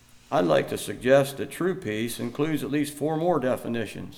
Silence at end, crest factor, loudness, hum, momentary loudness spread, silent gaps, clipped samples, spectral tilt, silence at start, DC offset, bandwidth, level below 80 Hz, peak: 0 s; 18 dB; -26 LUFS; none; 9 LU; none; under 0.1%; -5.5 dB/octave; 0.15 s; under 0.1%; 17 kHz; -58 dBFS; -8 dBFS